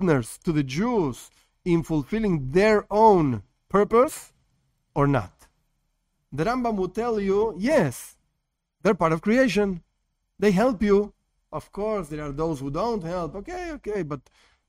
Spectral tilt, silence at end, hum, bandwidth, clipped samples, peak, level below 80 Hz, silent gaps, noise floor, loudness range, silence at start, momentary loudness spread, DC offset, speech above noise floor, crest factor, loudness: -6.5 dB/octave; 0.5 s; none; 16 kHz; under 0.1%; -6 dBFS; -46 dBFS; none; -78 dBFS; 6 LU; 0 s; 14 LU; under 0.1%; 55 dB; 20 dB; -24 LUFS